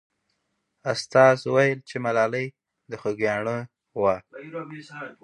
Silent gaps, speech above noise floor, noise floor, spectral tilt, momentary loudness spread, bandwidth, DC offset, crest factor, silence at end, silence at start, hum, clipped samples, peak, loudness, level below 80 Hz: none; 52 dB; -76 dBFS; -5.5 dB/octave; 19 LU; 11 kHz; under 0.1%; 22 dB; 0.1 s; 0.85 s; none; under 0.1%; -2 dBFS; -23 LUFS; -66 dBFS